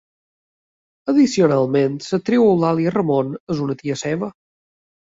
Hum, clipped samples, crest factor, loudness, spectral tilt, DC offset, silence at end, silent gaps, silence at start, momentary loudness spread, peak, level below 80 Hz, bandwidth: none; under 0.1%; 16 dB; -18 LUFS; -6.5 dB/octave; under 0.1%; 0.75 s; 3.40-3.47 s; 1.05 s; 9 LU; -4 dBFS; -60 dBFS; 8 kHz